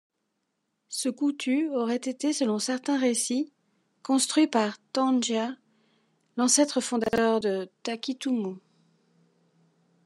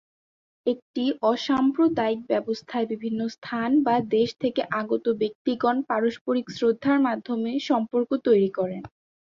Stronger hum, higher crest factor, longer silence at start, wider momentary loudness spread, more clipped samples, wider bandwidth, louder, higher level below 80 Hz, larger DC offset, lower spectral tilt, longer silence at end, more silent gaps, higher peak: neither; first, 22 dB vs 16 dB; first, 0.9 s vs 0.65 s; first, 12 LU vs 8 LU; neither; first, 12.5 kHz vs 7.4 kHz; about the same, -27 LUFS vs -25 LUFS; about the same, -70 dBFS vs -66 dBFS; neither; second, -3 dB/octave vs -6.5 dB/octave; first, 1.45 s vs 0.45 s; second, none vs 0.82-0.94 s, 3.38-3.42 s, 5.35-5.45 s, 6.21-6.25 s; about the same, -6 dBFS vs -8 dBFS